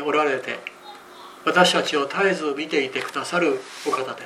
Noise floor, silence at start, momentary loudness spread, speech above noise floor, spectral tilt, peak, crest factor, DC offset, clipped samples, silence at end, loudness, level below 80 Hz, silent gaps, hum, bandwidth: -43 dBFS; 0 s; 20 LU; 20 dB; -3.5 dB/octave; -4 dBFS; 20 dB; under 0.1%; under 0.1%; 0 s; -22 LUFS; -74 dBFS; none; none; 15 kHz